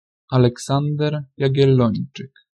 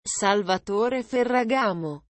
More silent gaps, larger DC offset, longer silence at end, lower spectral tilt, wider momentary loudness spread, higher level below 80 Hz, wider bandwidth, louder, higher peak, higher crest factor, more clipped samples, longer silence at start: neither; neither; first, 0.35 s vs 0.2 s; first, -7.5 dB/octave vs -3.5 dB/octave; first, 11 LU vs 4 LU; first, -54 dBFS vs -62 dBFS; first, 10.5 kHz vs 8.8 kHz; first, -19 LUFS vs -24 LUFS; first, -2 dBFS vs -8 dBFS; about the same, 16 dB vs 16 dB; neither; first, 0.3 s vs 0.05 s